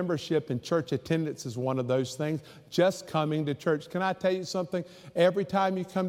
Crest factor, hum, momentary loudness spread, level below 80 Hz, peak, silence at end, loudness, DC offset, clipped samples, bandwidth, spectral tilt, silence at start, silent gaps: 18 dB; none; 7 LU; -68 dBFS; -10 dBFS; 0 s; -29 LUFS; under 0.1%; under 0.1%; 16 kHz; -6 dB/octave; 0 s; none